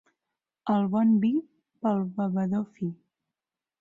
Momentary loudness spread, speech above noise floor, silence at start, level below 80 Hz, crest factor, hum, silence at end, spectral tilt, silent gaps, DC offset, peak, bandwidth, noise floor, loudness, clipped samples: 12 LU; 64 dB; 0.65 s; -72 dBFS; 14 dB; none; 0.85 s; -10 dB/octave; none; under 0.1%; -14 dBFS; 4.2 kHz; -90 dBFS; -27 LUFS; under 0.1%